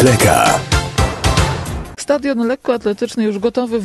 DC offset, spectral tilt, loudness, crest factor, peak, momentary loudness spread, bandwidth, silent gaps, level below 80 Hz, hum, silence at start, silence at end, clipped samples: under 0.1%; -4.5 dB/octave; -16 LUFS; 14 dB; 0 dBFS; 8 LU; 13 kHz; none; -26 dBFS; none; 0 s; 0 s; under 0.1%